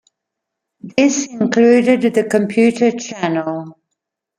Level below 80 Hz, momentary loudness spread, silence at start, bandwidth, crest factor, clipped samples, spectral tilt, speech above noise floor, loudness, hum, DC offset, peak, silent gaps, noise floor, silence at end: -60 dBFS; 11 LU; 0.85 s; 11 kHz; 16 dB; under 0.1%; -5 dB/octave; 65 dB; -15 LUFS; none; under 0.1%; 0 dBFS; none; -79 dBFS; 0.65 s